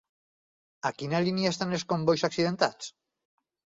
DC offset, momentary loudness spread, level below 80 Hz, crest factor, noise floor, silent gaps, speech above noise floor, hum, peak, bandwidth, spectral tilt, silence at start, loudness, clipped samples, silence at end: under 0.1%; 8 LU; -68 dBFS; 22 dB; under -90 dBFS; none; over 62 dB; none; -8 dBFS; 7.8 kHz; -5 dB/octave; 0.85 s; -28 LUFS; under 0.1%; 0.9 s